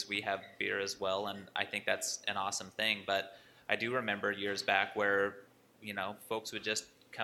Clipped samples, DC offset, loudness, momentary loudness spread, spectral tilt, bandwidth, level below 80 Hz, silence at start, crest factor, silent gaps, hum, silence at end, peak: under 0.1%; under 0.1%; -35 LUFS; 9 LU; -2 dB/octave; 16.5 kHz; -78 dBFS; 0 s; 24 dB; none; none; 0 s; -14 dBFS